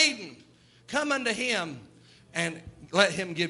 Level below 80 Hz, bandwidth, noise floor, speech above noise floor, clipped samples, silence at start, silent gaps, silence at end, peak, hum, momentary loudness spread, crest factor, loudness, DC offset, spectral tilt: -64 dBFS; 11.5 kHz; -57 dBFS; 29 dB; under 0.1%; 0 s; none; 0 s; -4 dBFS; none; 18 LU; 24 dB; -28 LUFS; under 0.1%; -2.5 dB/octave